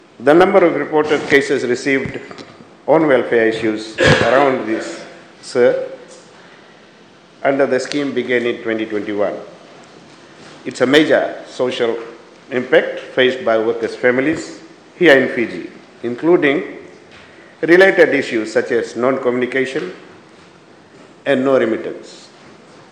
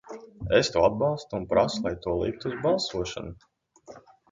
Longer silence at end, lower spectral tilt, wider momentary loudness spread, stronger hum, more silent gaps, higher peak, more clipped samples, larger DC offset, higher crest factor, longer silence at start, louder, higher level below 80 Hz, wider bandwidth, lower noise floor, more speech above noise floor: first, 0.65 s vs 0.3 s; about the same, -5 dB/octave vs -5 dB/octave; first, 19 LU vs 15 LU; neither; neither; first, 0 dBFS vs -8 dBFS; first, 0.1% vs under 0.1%; neither; about the same, 16 dB vs 20 dB; first, 0.2 s vs 0.05 s; first, -15 LUFS vs -26 LUFS; about the same, -52 dBFS vs -48 dBFS; first, 10.5 kHz vs 9.4 kHz; second, -45 dBFS vs -50 dBFS; first, 30 dB vs 24 dB